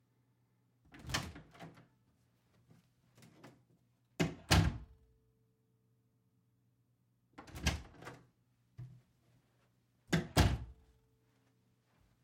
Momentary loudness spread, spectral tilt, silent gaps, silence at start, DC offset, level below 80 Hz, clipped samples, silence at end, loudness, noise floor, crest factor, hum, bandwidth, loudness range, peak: 25 LU; -4.5 dB/octave; none; 0.95 s; under 0.1%; -50 dBFS; under 0.1%; 1.5 s; -36 LUFS; -77 dBFS; 26 dB; none; 16.5 kHz; 10 LU; -16 dBFS